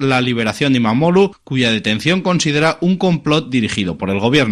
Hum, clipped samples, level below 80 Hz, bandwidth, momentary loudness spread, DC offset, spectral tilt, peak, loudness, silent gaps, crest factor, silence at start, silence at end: none; under 0.1%; -48 dBFS; 12.5 kHz; 4 LU; under 0.1%; -5.5 dB/octave; 0 dBFS; -15 LUFS; none; 14 dB; 0 s; 0 s